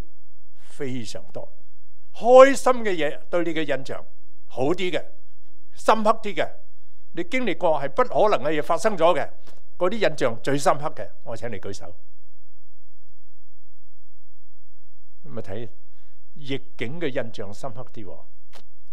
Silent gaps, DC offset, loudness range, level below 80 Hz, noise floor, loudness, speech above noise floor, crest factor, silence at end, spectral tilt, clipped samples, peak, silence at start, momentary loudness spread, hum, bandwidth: none; 10%; 20 LU; -60 dBFS; -64 dBFS; -23 LUFS; 41 dB; 26 dB; 0.75 s; -5 dB/octave; under 0.1%; 0 dBFS; 0.8 s; 18 LU; none; 13.5 kHz